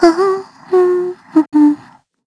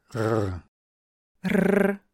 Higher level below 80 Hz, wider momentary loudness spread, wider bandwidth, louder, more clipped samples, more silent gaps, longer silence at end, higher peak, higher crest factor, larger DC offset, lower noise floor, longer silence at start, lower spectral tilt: about the same, -54 dBFS vs -54 dBFS; second, 8 LU vs 12 LU; second, 11 kHz vs 16 kHz; first, -14 LUFS vs -25 LUFS; neither; second, none vs 0.68-1.35 s; first, 0.5 s vs 0.15 s; first, 0 dBFS vs -8 dBFS; about the same, 14 dB vs 18 dB; neither; second, -43 dBFS vs under -90 dBFS; about the same, 0 s vs 0.1 s; second, -5.5 dB/octave vs -7.5 dB/octave